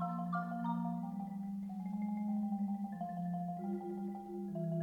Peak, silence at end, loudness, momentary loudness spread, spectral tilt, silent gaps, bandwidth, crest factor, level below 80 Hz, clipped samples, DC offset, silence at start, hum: -26 dBFS; 0 s; -40 LUFS; 5 LU; -10 dB/octave; none; 4.8 kHz; 12 dB; -74 dBFS; under 0.1%; under 0.1%; 0 s; none